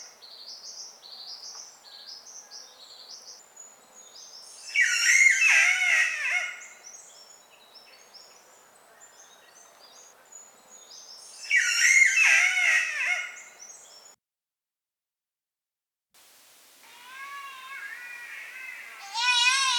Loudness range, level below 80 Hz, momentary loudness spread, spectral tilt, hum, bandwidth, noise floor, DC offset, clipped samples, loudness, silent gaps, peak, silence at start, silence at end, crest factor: 21 LU; under -90 dBFS; 27 LU; 5.5 dB/octave; none; 19.5 kHz; under -90 dBFS; under 0.1%; under 0.1%; -20 LUFS; none; -8 dBFS; 0 s; 0 s; 22 dB